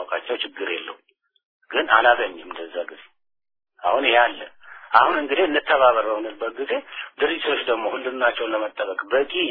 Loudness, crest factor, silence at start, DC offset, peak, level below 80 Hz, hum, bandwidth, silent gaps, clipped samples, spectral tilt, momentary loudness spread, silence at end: -21 LUFS; 22 dB; 0 s; under 0.1%; 0 dBFS; -64 dBFS; none; 4.9 kHz; 1.45-1.60 s; under 0.1%; -5.5 dB/octave; 15 LU; 0 s